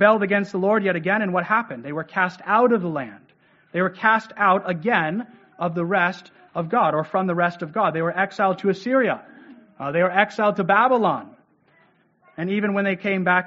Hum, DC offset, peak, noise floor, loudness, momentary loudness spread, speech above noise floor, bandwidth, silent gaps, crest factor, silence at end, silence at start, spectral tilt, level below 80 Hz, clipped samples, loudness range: none; under 0.1%; 0 dBFS; -60 dBFS; -21 LUFS; 12 LU; 39 dB; 7.6 kHz; none; 22 dB; 0 s; 0 s; -4.5 dB/octave; -70 dBFS; under 0.1%; 2 LU